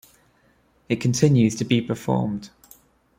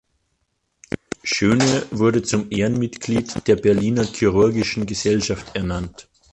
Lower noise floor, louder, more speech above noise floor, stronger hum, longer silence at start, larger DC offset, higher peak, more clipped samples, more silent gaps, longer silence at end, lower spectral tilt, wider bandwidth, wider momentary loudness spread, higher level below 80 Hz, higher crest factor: second, -61 dBFS vs -71 dBFS; about the same, -22 LUFS vs -20 LUFS; second, 40 dB vs 52 dB; neither; second, 0.9 s vs 1.25 s; neither; about the same, -4 dBFS vs -4 dBFS; neither; neither; first, 0.7 s vs 0.3 s; about the same, -6 dB/octave vs -5 dB/octave; first, 16 kHz vs 11 kHz; about the same, 11 LU vs 10 LU; second, -56 dBFS vs -44 dBFS; about the same, 20 dB vs 16 dB